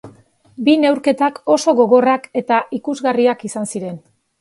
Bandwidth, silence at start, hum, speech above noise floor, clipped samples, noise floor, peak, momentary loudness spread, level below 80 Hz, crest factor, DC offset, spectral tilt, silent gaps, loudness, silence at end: 11.5 kHz; 0.05 s; none; 32 dB; under 0.1%; -48 dBFS; 0 dBFS; 12 LU; -64 dBFS; 16 dB; under 0.1%; -4.5 dB/octave; none; -16 LUFS; 0.4 s